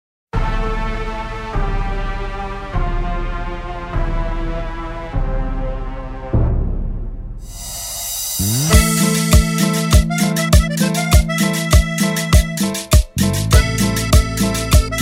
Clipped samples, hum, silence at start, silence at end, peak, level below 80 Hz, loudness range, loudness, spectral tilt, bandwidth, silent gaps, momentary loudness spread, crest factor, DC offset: under 0.1%; none; 0.35 s; 0 s; 0 dBFS; -20 dBFS; 10 LU; -18 LUFS; -4.5 dB/octave; 16.5 kHz; none; 13 LU; 16 dB; under 0.1%